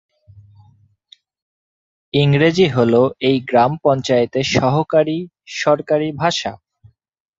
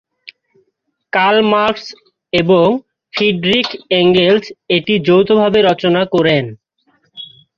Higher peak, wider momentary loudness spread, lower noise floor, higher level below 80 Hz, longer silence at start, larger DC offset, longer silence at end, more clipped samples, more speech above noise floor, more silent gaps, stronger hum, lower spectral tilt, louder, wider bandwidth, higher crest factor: about the same, 0 dBFS vs -2 dBFS; second, 8 LU vs 14 LU; second, -53 dBFS vs -67 dBFS; about the same, -52 dBFS vs -52 dBFS; first, 2.15 s vs 0.25 s; neither; first, 0.85 s vs 0.3 s; neither; second, 38 dB vs 55 dB; neither; neither; about the same, -6 dB/octave vs -6.5 dB/octave; second, -16 LUFS vs -13 LUFS; about the same, 7.8 kHz vs 7.2 kHz; about the same, 18 dB vs 14 dB